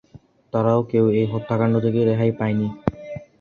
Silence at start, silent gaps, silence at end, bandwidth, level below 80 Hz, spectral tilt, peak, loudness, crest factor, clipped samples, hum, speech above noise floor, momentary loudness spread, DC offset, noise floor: 0.15 s; none; 0.2 s; 6.6 kHz; -50 dBFS; -10 dB/octave; -2 dBFS; -21 LUFS; 18 dB; under 0.1%; none; 30 dB; 9 LU; under 0.1%; -49 dBFS